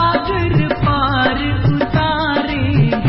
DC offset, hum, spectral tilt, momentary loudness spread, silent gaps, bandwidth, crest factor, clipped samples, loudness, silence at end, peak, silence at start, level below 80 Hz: under 0.1%; none; -12 dB/octave; 2 LU; none; 5.8 kHz; 12 dB; under 0.1%; -16 LUFS; 0 s; -4 dBFS; 0 s; -28 dBFS